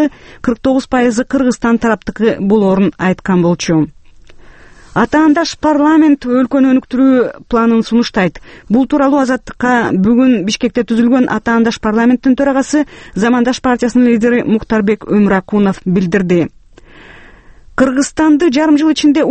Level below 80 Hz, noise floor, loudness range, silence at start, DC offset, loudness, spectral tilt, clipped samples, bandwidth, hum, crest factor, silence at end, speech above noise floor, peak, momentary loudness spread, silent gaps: -40 dBFS; -39 dBFS; 3 LU; 0 s; under 0.1%; -12 LUFS; -6 dB/octave; under 0.1%; 8.8 kHz; none; 12 dB; 0 s; 28 dB; 0 dBFS; 6 LU; none